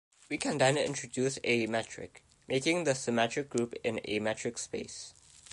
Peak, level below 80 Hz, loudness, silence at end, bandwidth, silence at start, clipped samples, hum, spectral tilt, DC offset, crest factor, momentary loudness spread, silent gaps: -12 dBFS; -68 dBFS; -32 LUFS; 0 s; 11.5 kHz; 0.3 s; under 0.1%; none; -4 dB/octave; under 0.1%; 20 dB; 15 LU; none